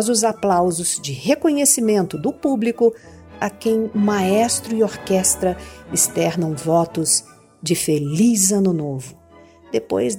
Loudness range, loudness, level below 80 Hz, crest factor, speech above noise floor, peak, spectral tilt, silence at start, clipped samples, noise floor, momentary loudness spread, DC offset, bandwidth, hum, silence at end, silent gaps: 1 LU; -18 LUFS; -52 dBFS; 18 dB; 28 dB; 0 dBFS; -4 dB/octave; 0 s; under 0.1%; -47 dBFS; 9 LU; under 0.1%; 17 kHz; none; 0 s; none